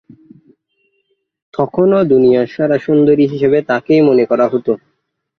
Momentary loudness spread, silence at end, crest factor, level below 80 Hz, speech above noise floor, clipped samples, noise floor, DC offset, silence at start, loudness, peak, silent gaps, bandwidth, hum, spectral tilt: 9 LU; 0.6 s; 12 dB; -54 dBFS; 56 dB; under 0.1%; -68 dBFS; under 0.1%; 1.6 s; -13 LUFS; -2 dBFS; none; 6.4 kHz; none; -9 dB/octave